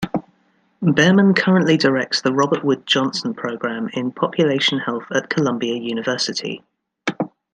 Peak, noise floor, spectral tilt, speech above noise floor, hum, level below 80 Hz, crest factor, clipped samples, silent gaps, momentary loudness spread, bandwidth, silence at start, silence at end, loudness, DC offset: -2 dBFS; -61 dBFS; -5 dB/octave; 43 dB; none; -60 dBFS; 18 dB; under 0.1%; none; 12 LU; 9.4 kHz; 0 s; 0.25 s; -19 LUFS; under 0.1%